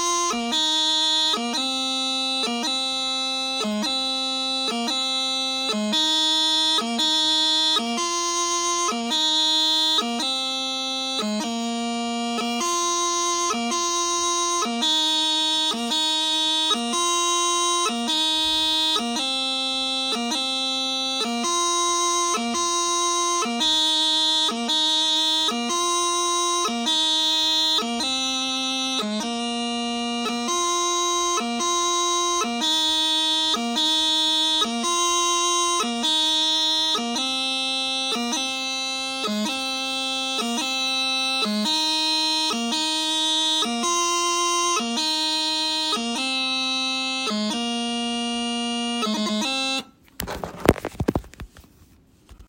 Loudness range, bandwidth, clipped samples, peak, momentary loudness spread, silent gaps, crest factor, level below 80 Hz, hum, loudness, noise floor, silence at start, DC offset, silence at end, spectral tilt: 4 LU; 16.5 kHz; under 0.1%; 0 dBFS; 6 LU; none; 22 dB; -54 dBFS; none; -21 LUFS; -54 dBFS; 0 s; under 0.1%; 0.05 s; -1 dB/octave